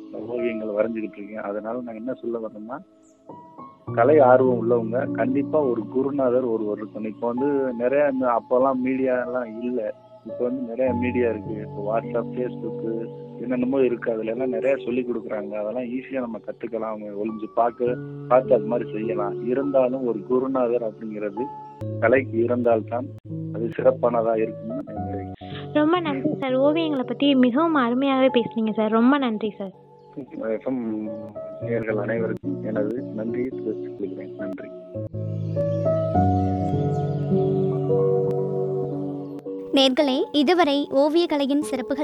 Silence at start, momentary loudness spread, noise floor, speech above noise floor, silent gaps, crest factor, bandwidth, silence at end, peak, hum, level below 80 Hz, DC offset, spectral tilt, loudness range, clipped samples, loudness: 0 s; 13 LU; -45 dBFS; 22 dB; 23.20-23.24 s; 20 dB; 11 kHz; 0 s; -4 dBFS; none; -60 dBFS; under 0.1%; -7.5 dB/octave; 7 LU; under 0.1%; -23 LUFS